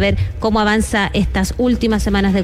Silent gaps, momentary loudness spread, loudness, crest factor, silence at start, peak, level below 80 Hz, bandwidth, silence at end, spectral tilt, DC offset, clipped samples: none; 3 LU; -16 LUFS; 10 dB; 0 s; -6 dBFS; -26 dBFS; 15 kHz; 0 s; -5.5 dB/octave; under 0.1%; under 0.1%